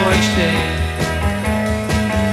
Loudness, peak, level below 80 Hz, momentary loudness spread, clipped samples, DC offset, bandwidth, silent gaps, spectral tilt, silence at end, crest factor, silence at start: -17 LUFS; -2 dBFS; -26 dBFS; 5 LU; under 0.1%; 0.2%; 15.5 kHz; none; -5 dB/octave; 0 s; 14 dB; 0 s